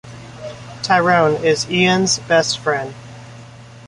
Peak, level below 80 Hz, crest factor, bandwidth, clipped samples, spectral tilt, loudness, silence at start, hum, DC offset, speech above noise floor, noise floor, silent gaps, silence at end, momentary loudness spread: -2 dBFS; -52 dBFS; 16 dB; 11.5 kHz; under 0.1%; -3.5 dB/octave; -16 LUFS; 0.05 s; none; under 0.1%; 23 dB; -39 dBFS; none; 0 s; 22 LU